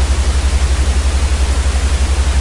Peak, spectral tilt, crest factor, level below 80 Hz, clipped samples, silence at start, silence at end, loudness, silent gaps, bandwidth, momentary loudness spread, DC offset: -2 dBFS; -4.5 dB/octave; 10 dB; -14 dBFS; under 0.1%; 0 s; 0 s; -15 LUFS; none; 11.5 kHz; 1 LU; under 0.1%